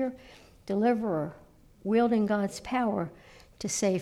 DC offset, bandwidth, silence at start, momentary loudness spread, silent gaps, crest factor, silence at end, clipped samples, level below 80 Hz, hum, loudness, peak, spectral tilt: under 0.1%; 14 kHz; 0 s; 14 LU; none; 14 dB; 0 s; under 0.1%; -60 dBFS; none; -29 LUFS; -16 dBFS; -5 dB/octave